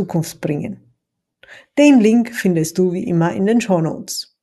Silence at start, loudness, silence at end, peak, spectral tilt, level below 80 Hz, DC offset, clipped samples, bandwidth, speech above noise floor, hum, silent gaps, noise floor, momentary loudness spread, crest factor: 0 s; -16 LUFS; 0.2 s; 0 dBFS; -6 dB/octave; -58 dBFS; under 0.1%; under 0.1%; 12.5 kHz; 58 dB; none; none; -75 dBFS; 13 LU; 16 dB